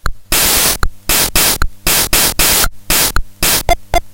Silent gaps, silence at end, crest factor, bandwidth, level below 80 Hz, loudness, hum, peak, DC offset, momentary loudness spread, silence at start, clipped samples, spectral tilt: none; 0 s; 12 dB; 17.5 kHz; -20 dBFS; -11 LUFS; none; 0 dBFS; under 0.1%; 6 LU; 0.05 s; under 0.1%; -1 dB/octave